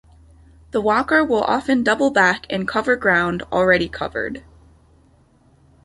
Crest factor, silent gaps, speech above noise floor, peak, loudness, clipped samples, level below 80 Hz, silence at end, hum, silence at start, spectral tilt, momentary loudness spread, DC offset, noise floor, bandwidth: 18 dB; none; 36 dB; -2 dBFS; -18 LUFS; under 0.1%; -48 dBFS; 1.45 s; none; 0.75 s; -5 dB/octave; 9 LU; under 0.1%; -55 dBFS; 11.5 kHz